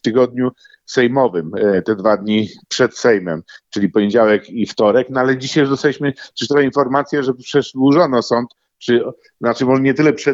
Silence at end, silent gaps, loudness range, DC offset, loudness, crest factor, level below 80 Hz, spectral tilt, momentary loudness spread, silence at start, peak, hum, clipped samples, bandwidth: 0 s; none; 1 LU; under 0.1%; -16 LUFS; 14 dB; -60 dBFS; -5.5 dB/octave; 9 LU; 0.05 s; 0 dBFS; none; under 0.1%; 8 kHz